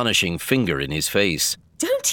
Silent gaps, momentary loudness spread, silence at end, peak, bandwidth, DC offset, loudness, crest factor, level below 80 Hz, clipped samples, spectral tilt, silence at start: none; 4 LU; 0 s; -4 dBFS; 19.5 kHz; under 0.1%; -21 LUFS; 16 dB; -46 dBFS; under 0.1%; -3 dB/octave; 0 s